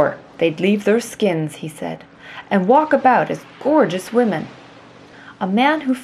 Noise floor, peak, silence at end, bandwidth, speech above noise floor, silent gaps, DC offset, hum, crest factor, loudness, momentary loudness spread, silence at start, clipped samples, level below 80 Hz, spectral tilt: -43 dBFS; -2 dBFS; 0 s; 13.5 kHz; 25 dB; none; under 0.1%; none; 16 dB; -18 LUFS; 15 LU; 0 s; under 0.1%; -64 dBFS; -6 dB/octave